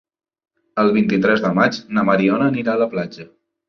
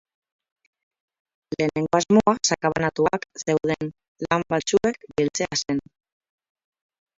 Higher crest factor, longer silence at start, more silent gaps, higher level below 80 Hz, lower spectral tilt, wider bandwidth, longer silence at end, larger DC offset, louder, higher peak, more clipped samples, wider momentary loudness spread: about the same, 16 dB vs 20 dB; second, 0.75 s vs 1.5 s; second, none vs 4.08-4.15 s; about the same, -58 dBFS vs -56 dBFS; first, -7 dB/octave vs -4.5 dB/octave; second, 6.6 kHz vs 7.8 kHz; second, 0.45 s vs 1.4 s; neither; first, -18 LUFS vs -23 LUFS; about the same, -2 dBFS vs -4 dBFS; neither; about the same, 8 LU vs 10 LU